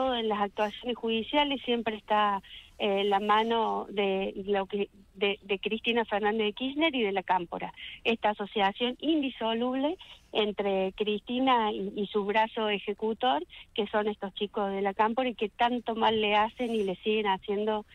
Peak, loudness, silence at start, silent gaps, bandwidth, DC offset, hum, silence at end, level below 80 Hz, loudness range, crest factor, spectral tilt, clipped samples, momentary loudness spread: -12 dBFS; -29 LUFS; 0 s; none; 9.6 kHz; under 0.1%; none; 0.1 s; -60 dBFS; 2 LU; 18 dB; -6 dB/octave; under 0.1%; 7 LU